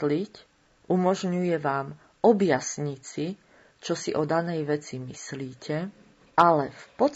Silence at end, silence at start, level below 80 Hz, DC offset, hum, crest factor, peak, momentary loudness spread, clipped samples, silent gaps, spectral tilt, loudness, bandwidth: 0 s; 0 s; -68 dBFS; under 0.1%; none; 20 dB; -6 dBFS; 16 LU; under 0.1%; none; -5.5 dB/octave; -27 LUFS; 8 kHz